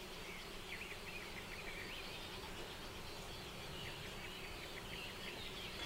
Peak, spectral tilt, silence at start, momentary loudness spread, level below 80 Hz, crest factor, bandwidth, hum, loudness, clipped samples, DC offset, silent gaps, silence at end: -34 dBFS; -3 dB/octave; 0 s; 2 LU; -58 dBFS; 16 dB; 16 kHz; none; -48 LUFS; under 0.1%; under 0.1%; none; 0 s